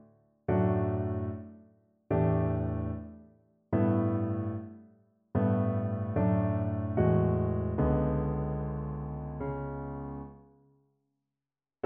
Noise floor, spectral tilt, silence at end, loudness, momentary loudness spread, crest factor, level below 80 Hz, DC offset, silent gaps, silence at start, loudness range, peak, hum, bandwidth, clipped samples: under -90 dBFS; -10.5 dB/octave; 1.5 s; -31 LUFS; 13 LU; 16 dB; -46 dBFS; under 0.1%; none; 0.5 s; 6 LU; -14 dBFS; none; 3.3 kHz; under 0.1%